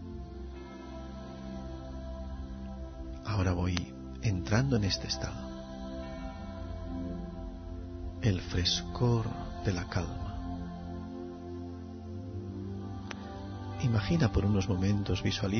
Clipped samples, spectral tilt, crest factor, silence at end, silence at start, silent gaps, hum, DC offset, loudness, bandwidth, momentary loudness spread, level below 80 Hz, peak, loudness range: under 0.1%; -6 dB/octave; 24 dB; 0 s; 0 s; none; none; under 0.1%; -35 LUFS; 6.6 kHz; 14 LU; -44 dBFS; -10 dBFS; 8 LU